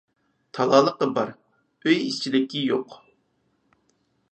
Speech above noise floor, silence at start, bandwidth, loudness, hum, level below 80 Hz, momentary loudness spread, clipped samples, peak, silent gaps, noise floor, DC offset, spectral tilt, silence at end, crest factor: 47 dB; 0.55 s; 8.8 kHz; -23 LUFS; none; -76 dBFS; 12 LU; under 0.1%; -4 dBFS; none; -69 dBFS; under 0.1%; -5 dB/octave; 1.35 s; 22 dB